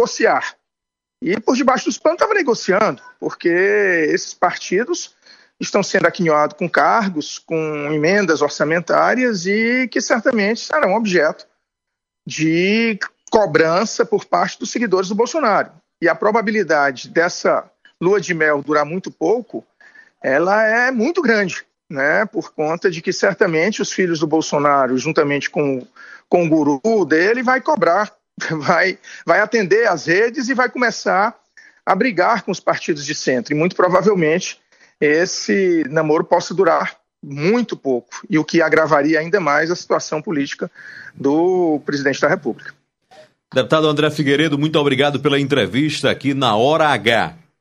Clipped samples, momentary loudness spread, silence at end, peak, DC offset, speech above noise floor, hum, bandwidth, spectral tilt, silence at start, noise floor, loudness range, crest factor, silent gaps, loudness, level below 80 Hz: under 0.1%; 8 LU; 0.25 s; 0 dBFS; under 0.1%; 66 dB; none; 11.5 kHz; -4.5 dB/octave; 0 s; -83 dBFS; 2 LU; 16 dB; none; -17 LUFS; -62 dBFS